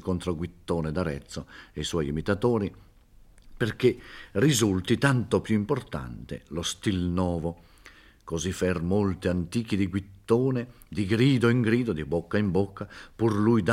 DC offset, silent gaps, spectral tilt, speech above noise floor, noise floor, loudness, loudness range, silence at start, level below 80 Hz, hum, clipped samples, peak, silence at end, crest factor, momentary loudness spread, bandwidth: under 0.1%; none; -6 dB/octave; 28 dB; -54 dBFS; -27 LUFS; 5 LU; 0.05 s; -50 dBFS; none; under 0.1%; -6 dBFS; 0 s; 20 dB; 14 LU; 15.5 kHz